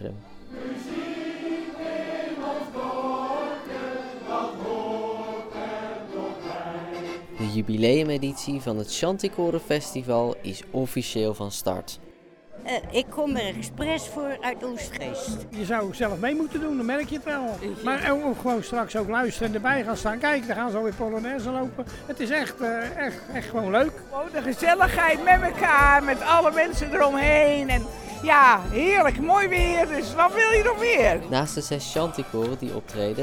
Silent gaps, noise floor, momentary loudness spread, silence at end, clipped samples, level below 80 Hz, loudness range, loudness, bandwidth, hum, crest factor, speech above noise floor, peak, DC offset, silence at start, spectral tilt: none; -48 dBFS; 14 LU; 0 s; under 0.1%; -40 dBFS; 11 LU; -24 LUFS; 18.5 kHz; none; 22 dB; 24 dB; -4 dBFS; under 0.1%; 0 s; -4.5 dB/octave